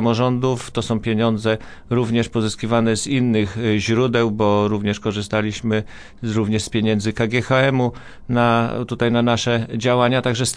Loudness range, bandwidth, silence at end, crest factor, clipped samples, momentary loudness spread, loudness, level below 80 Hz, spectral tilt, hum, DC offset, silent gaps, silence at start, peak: 2 LU; 10.5 kHz; 0 s; 16 dB; under 0.1%; 7 LU; -19 LUFS; -46 dBFS; -5.5 dB/octave; none; under 0.1%; none; 0 s; -4 dBFS